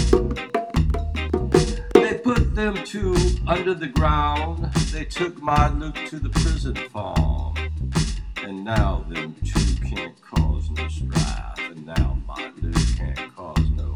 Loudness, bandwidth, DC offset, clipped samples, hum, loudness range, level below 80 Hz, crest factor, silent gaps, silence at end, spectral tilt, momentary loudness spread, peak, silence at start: -24 LUFS; 12 kHz; under 0.1%; under 0.1%; none; 4 LU; -26 dBFS; 22 dB; none; 0 s; -6 dB/octave; 10 LU; 0 dBFS; 0 s